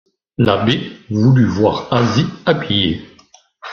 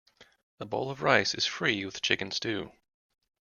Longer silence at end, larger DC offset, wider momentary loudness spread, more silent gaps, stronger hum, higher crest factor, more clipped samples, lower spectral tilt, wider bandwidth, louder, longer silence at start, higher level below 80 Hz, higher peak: second, 0 s vs 0.9 s; neither; about the same, 10 LU vs 12 LU; second, none vs 0.43-0.58 s; neither; second, 14 dB vs 26 dB; neither; first, -7 dB/octave vs -3 dB/octave; second, 7 kHz vs 11.5 kHz; first, -16 LUFS vs -29 LUFS; first, 0.4 s vs 0.2 s; first, -46 dBFS vs -68 dBFS; first, -2 dBFS vs -6 dBFS